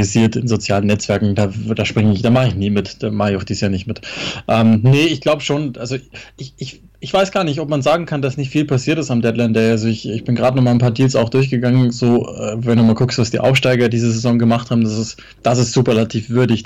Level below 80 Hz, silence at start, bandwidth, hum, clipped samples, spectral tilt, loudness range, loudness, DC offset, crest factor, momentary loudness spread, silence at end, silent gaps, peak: -46 dBFS; 0 s; 10.5 kHz; none; under 0.1%; -6 dB/octave; 3 LU; -16 LUFS; under 0.1%; 10 dB; 10 LU; 0 s; none; -6 dBFS